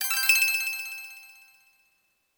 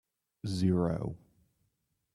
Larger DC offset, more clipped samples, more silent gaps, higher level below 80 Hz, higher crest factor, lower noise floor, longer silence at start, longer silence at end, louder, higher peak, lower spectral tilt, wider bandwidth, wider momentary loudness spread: neither; neither; neither; second, -72 dBFS vs -60 dBFS; about the same, 22 dB vs 18 dB; second, -71 dBFS vs -80 dBFS; second, 0 s vs 0.45 s; about the same, 1.1 s vs 1 s; first, -23 LUFS vs -32 LUFS; first, -6 dBFS vs -16 dBFS; second, 5.5 dB/octave vs -8 dB/octave; first, over 20 kHz vs 11.5 kHz; first, 22 LU vs 14 LU